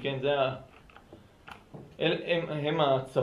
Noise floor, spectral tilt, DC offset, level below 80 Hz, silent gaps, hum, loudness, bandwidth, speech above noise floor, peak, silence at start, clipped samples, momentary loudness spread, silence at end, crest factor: -54 dBFS; -7 dB/octave; under 0.1%; -62 dBFS; none; none; -29 LUFS; 11.5 kHz; 26 dB; -12 dBFS; 0 s; under 0.1%; 22 LU; 0 s; 18 dB